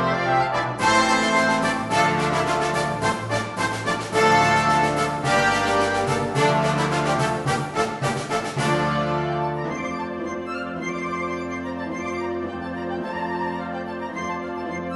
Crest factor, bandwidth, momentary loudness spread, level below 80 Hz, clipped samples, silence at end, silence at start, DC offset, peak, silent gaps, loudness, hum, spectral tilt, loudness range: 16 dB; 11.5 kHz; 11 LU; -48 dBFS; under 0.1%; 0 s; 0 s; under 0.1%; -6 dBFS; none; -22 LUFS; none; -4.5 dB/octave; 8 LU